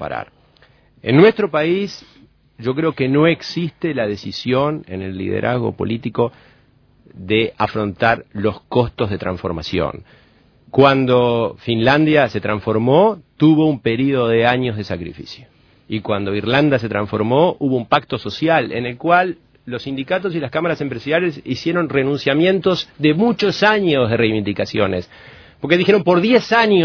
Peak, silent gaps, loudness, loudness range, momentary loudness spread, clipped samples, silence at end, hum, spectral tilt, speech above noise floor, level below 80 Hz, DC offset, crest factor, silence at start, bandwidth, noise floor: 0 dBFS; none; -17 LUFS; 5 LU; 13 LU; under 0.1%; 0 s; none; -7 dB/octave; 36 dB; -48 dBFS; under 0.1%; 18 dB; 0 s; 5.4 kHz; -53 dBFS